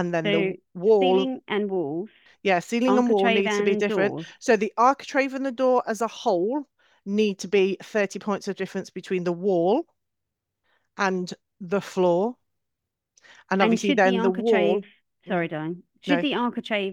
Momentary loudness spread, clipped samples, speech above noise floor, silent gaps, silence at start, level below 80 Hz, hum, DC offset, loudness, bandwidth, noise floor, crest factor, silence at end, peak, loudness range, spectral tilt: 11 LU; under 0.1%; 61 dB; none; 0 s; -76 dBFS; none; under 0.1%; -24 LUFS; 12.5 kHz; -84 dBFS; 20 dB; 0 s; -4 dBFS; 5 LU; -5.5 dB/octave